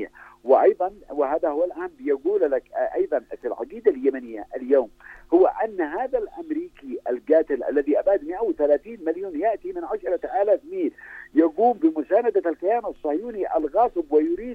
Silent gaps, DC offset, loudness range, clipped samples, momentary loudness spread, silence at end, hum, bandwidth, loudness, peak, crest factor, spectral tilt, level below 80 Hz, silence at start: none; under 0.1%; 2 LU; under 0.1%; 11 LU; 0 s; none; 4.8 kHz; -23 LUFS; -4 dBFS; 18 dB; -7.5 dB/octave; -56 dBFS; 0 s